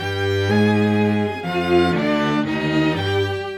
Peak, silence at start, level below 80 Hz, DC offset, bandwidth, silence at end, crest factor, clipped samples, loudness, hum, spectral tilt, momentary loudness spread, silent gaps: -6 dBFS; 0 s; -50 dBFS; under 0.1%; 14.5 kHz; 0 s; 14 dB; under 0.1%; -19 LUFS; none; -6.5 dB/octave; 5 LU; none